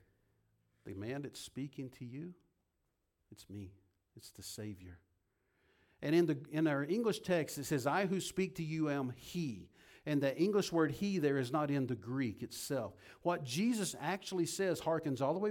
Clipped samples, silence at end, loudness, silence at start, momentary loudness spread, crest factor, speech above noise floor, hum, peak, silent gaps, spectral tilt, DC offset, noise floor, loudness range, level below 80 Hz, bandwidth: under 0.1%; 0 s; -37 LUFS; 0.85 s; 16 LU; 18 dB; 46 dB; none; -20 dBFS; none; -5.5 dB/octave; under 0.1%; -83 dBFS; 15 LU; -72 dBFS; 18 kHz